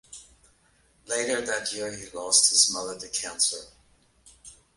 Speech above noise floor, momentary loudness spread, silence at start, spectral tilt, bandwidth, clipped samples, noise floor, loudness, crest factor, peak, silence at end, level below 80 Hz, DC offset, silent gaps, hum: 37 dB; 18 LU; 0.1 s; 0.5 dB/octave; 12 kHz; under 0.1%; -64 dBFS; -24 LUFS; 24 dB; -4 dBFS; 0.25 s; -64 dBFS; under 0.1%; none; none